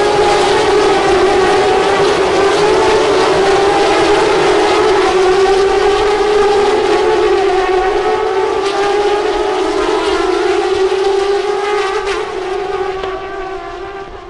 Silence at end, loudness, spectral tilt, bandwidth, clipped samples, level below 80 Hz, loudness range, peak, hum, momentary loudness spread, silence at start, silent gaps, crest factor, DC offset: 0 s; -12 LUFS; -4 dB/octave; 11.5 kHz; under 0.1%; -36 dBFS; 4 LU; -4 dBFS; none; 8 LU; 0 s; none; 8 dB; 0.7%